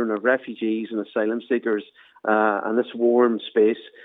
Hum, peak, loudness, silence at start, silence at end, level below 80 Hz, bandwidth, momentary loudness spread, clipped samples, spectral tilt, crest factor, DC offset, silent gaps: none; -6 dBFS; -22 LUFS; 0 s; 0 s; -88 dBFS; 4 kHz; 7 LU; under 0.1%; -8.5 dB/octave; 16 dB; under 0.1%; none